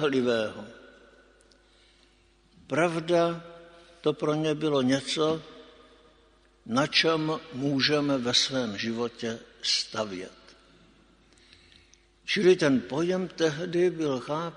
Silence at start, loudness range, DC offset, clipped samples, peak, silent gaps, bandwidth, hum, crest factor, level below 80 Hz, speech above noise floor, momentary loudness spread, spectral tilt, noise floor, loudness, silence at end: 0 s; 5 LU; under 0.1%; under 0.1%; -8 dBFS; none; 10.5 kHz; none; 20 dB; -66 dBFS; 35 dB; 12 LU; -4.5 dB/octave; -62 dBFS; -27 LUFS; 0 s